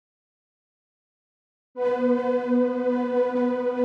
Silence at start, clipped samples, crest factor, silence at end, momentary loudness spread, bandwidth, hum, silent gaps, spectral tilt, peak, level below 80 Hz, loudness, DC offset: 1.75 s; under 0.1%; 14 dB; 0 s; 4 LU; 5.8 kHz; none; none; -7 dB/octave; -12 dBFS; -76 dBFS; -24 LUFS; under 0.1%